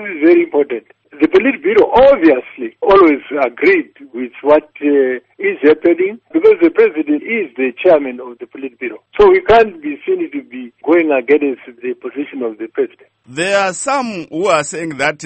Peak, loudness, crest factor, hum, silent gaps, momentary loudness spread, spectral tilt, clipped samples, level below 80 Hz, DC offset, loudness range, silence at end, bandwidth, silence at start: 0 dBFS; -13 LUFS; 14 dB; none; none; 16 LU; -4.5 dB/octave; under 0.1%; -46 dBFS; under 0.1%; 6 LU; 0 s; 8.8 kHz; 0 s